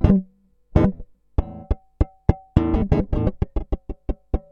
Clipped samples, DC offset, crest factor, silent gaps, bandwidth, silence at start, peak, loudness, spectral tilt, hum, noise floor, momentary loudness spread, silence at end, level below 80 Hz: under 0.1%; under 0.1%; 22 dB; none; 5.6 kHz; 0 s; 0 dBFS; -24 LUFS; -10.5 dB/octave; none; -54 dBFS; 12 LU; 0.1 s; -26 dBFS